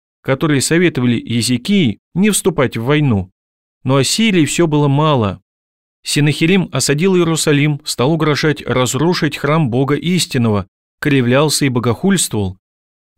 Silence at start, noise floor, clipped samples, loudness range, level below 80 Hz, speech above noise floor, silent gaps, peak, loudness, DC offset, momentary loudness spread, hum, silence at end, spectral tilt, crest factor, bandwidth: 0.25 s; under -90 dBFS; under 0.1%; 1 LU; -46 dBFS; over 76 dB; 1.99-2.11 s, 3.32-3.81 s, 5.42-6.03 s, 10.68-10.98 s; -2 dBFS; -14 LUFS; 0.6%; 5 LU; none; 0.65 s; -5 dB/octave; 14 dB; 16.5 kHz